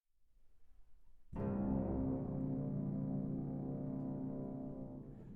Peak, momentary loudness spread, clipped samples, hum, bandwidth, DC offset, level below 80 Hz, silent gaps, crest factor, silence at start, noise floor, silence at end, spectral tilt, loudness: -26 dBFS; 10 LU; under 0.1%; none; 2.9 kHz; under 0.1%; -56 dBFS; none; 16 dB; 0.2 s; -66 dBFS; 0 s; -13 dB/octave; -42 LUFS